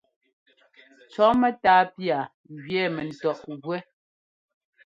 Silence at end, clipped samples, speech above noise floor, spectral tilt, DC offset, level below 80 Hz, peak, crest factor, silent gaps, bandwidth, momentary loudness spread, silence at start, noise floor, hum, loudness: 1.05 s; under 0.1%; over 66 dB; -6.5 dB/octave; under 0.1%; -62 dBFS; -6 dBFS; 20 dB; 2.34-2.44 s; 7.6 kHz; 15 LU; 1.15 s; under -90 dBFS; none; -24 LUFS